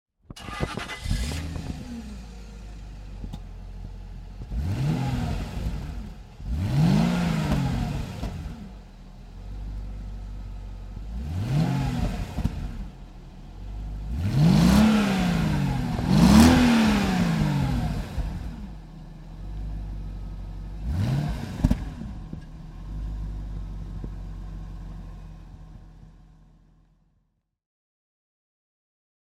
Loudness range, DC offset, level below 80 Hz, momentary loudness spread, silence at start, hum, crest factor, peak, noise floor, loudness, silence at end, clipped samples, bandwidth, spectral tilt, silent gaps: 18 LU; under 0.1%; -34 dBFS; 23 LU; 0.3 s; none; 24 dB; -2 dBFS; -72 dBFS; -25 LUFS; 3.15 s; under 0.1%; 16 kHz; -6.5 dB/octave; none